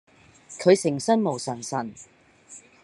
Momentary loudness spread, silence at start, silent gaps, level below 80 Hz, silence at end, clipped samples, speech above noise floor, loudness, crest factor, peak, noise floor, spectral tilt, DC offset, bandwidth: 25 LU; 0.5 s; none; -72 dBFS; 0.25 s; under 0.1%; 27 dB; -24 LUFS; 22 dB; -4 dBFS; -50 dBFS; -5 dB/octave; under 0.1%; 11.5 kHz